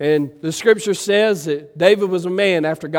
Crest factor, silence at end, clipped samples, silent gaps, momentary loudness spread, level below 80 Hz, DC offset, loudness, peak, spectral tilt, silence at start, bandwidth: 16 dB; 0 s; under 0.1%; none; 6 LU; -64 dBFS; under 0.1%; -17 LUFS; 0 dBFS; -4.5 dB/octave; 0 s; 16.5 kHz